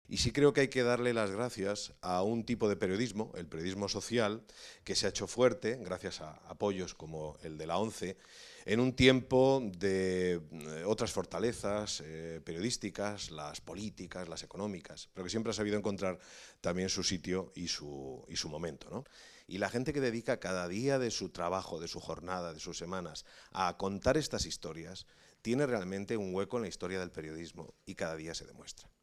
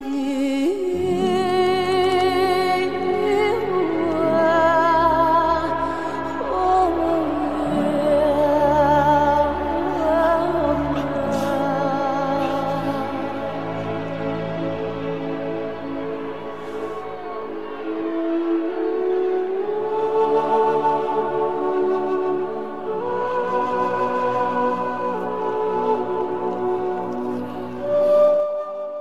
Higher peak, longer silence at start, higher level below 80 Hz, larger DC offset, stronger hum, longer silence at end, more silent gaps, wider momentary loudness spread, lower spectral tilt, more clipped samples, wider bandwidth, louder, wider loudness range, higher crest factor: second, -10 dBFS vs -6 dBFS; about the same, 0.1 s vs 0 s; second, -58 dBFS vs -46 dBFS; second, under 0.1% vs 1%; neither; first, 0.15 s vs 0 s; neither; first, 15 LU vs 11 LU; second, -4.5 dB/octave vs -6.5 dB/octave; neither; about the same, 13.5 kHz vs 14 kHz; second, -35 LUFS vs -21 LUFS; about the same, 8 LU vs 8 LU; first, 26 dB vs 16 dB